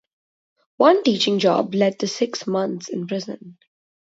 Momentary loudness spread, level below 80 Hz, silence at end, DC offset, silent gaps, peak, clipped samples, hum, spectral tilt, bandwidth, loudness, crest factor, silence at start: 13 LU; -70 dBFS; 0.6 s; under 0.1%; none; -2 dBFS; under 0.1%; none; -5 dB/octave; 8 kHz; -20 LUFS; 20 dB; 0.8 s